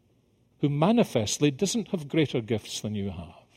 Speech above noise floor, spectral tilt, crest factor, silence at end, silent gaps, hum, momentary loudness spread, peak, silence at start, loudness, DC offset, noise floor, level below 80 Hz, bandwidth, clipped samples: 39 dB; -5 dB/octave; 20 dB; 0.25 s; none; none; 10 LU; -8 dBFS; 0.6 s; -27 LUFS; under 0.1%; -65 dBFS; -60 dBFS; 16 kHz; under 0.1%